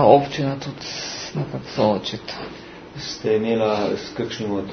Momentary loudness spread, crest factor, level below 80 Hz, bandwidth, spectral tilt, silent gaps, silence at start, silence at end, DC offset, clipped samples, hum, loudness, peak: 13 LU; 22 dB; -54 dBFS; 6.6 kHz; -5.5 dB/octave; none; 0 s; 0 s; under 0.1%; under 0.1%; none; -23 LUFS; 0 dBFS